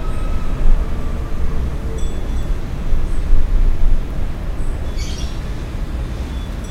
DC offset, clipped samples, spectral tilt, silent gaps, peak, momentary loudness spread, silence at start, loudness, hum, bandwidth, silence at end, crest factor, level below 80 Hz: under 0.1%; under 0.1%; -6.5 dB/octave; none; 0 dBFS; 6 LU; 0 s; -24 LUFS; none; 8.4 kHz; 0 s; 14 dB; -16 dBFS